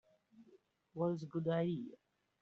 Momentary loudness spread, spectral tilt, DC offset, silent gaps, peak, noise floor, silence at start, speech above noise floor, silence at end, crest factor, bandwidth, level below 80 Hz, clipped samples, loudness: 14 LU; -7.5 dB/octave; under 0.1%; none; -24 dBFS; -69 dBFS; 0.4 s; 31 dB; 0.45 s; 18 dB; 6.8 kHz; -82 dBFS; under 0.1%; -39 LUFS